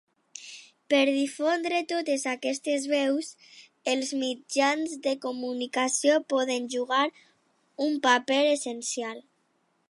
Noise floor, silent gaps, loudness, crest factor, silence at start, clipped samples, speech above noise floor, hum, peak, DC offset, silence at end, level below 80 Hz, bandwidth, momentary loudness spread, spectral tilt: -71 dBFS; none; -27 LUFS; 20 dB; 0.35 s; under 0.1%; 45 dB; none; -6 dBFS; under 0.1%; 0.7 s; -84 dBFS; 11.5 kHz; 13 LU; -1 dB/octave